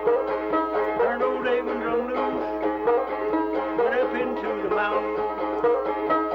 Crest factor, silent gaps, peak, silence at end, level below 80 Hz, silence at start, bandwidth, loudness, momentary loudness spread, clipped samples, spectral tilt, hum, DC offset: 14 dB; none; -10 dBFS; 0 s; -54 dBFS; 0 s; 6 kHz; -25 LUFS; 4 LU; under 0.1%; -7 dB/octave; none; under 0.1%